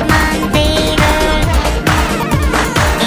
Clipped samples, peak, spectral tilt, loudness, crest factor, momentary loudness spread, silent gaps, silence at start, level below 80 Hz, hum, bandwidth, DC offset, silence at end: under 0.1%; 0 dBFS; -4.5 dB/octave; -13 LUFS; 12 dB; 2 LU; none; 0 s; -18 dBFS; none; 16 kHz; under 0.1%; 0 s